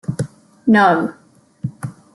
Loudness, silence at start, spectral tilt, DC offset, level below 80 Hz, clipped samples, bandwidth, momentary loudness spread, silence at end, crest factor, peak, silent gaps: -17 LUFS; 0.1 s; -7 dB/octave; under 0.1%; -56 dBFS; under 0.1%; 12 kHz; 18 LU; 0.25 s; 16 dB; -2 dBFS; none